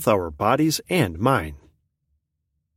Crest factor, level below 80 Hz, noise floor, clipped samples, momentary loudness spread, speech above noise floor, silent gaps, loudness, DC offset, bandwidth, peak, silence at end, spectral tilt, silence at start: 20 dB; -46 dBFS; -76 dBFS; under 0.1%; 4 LU; 55 dB; none; -22 LUFS; under 0.1%; 16.5 kHz; -4 dBFS; 1.2 s; -5.5 dB/octave; 0 s